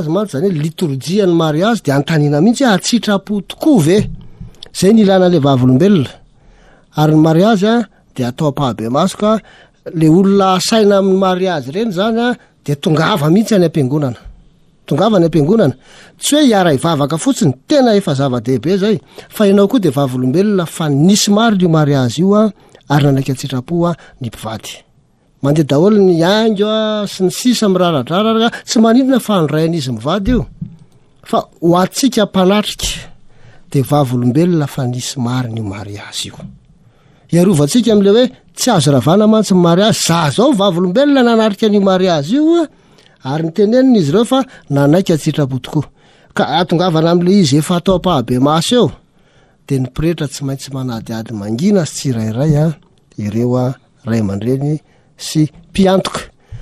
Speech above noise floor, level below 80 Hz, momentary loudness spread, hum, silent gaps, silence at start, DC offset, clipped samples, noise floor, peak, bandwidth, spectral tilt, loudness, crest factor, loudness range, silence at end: 40 dB; -40 dBFS; 12 LU; none; none; 0 s; under 0.1%; under 0.1%; -52 dBFS; 0 dBFS; 14 kHz; -6 dB/octave; -13 LUFS; 12 dB; 5 LU; 0 s